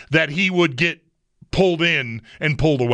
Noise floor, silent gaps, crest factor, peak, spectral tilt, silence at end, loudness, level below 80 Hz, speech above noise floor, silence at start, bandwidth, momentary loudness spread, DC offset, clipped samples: -54 dBFS; none; 16 dB; -4 dBFS; -6 dB/octave; 0 s; -19 LUFS; -40 dBFS; 35 dB; 0 s; 10 kHz; 9 LU; under 0.1%; under 0.1%